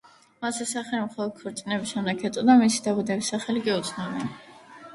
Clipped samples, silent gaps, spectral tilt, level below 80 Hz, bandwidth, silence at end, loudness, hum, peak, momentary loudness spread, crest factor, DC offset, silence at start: under 0.1%; none; -4 dB/octave; -68 dBFS; 11.5 kHz; 0 s; -26 LUFS; none; -6 dBFS; 14 LU; 20 dB; under 0.1%; 0.4 s